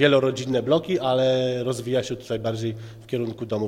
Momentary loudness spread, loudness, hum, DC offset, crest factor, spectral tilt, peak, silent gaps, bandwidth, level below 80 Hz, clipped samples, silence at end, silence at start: 9 LU; -24 LUFS; none; under 0.1%; 18 dB; -6 dB/octave; -4 dBFS; none; 15 kHz; -58 dBFS; under 0.1%; 0 s; 0 s